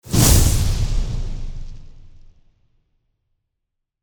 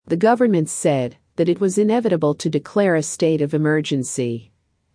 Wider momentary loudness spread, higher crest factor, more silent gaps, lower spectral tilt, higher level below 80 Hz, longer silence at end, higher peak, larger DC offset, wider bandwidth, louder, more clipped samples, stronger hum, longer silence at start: first, 22 LU vs 6 LU; about the same, 20 dB vs 16 dB; neither; second, -4 dB/octave vs -5.5 dB/octave; first, -24 dBFS vs -64 dBFS; first, 2 s vs 0.5 s; first, 0 dBFS vs -4 dBFS; neither; first, over 20 kHz vs 10.5 kHz; about the same, -18 LUFS vs -19 LUFS; neither; neither; about the same, 0.05 s vs 0.05 s